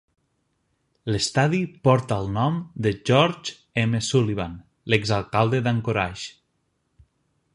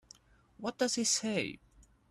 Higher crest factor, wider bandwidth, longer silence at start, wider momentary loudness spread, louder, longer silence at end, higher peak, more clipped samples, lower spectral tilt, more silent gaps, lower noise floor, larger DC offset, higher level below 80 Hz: about the same, 22 dB vs 18 dB; second, 11 kHz vs 13 kHz; first, 1.05 s vs 0.6 s; about the same, 12 LU vs 12 LU; first, -23 LUFS vs -33 LUFS; first, 1.25 s vs 0.55 s; first, -2 dBFS vs -18 dBFS; neither; first, -5.5 dB/octave vs -2 dB/octave; neither; first, -72 dBFS vs -61 dBFS; neither; first, -50 dBFS vs -68 dBFS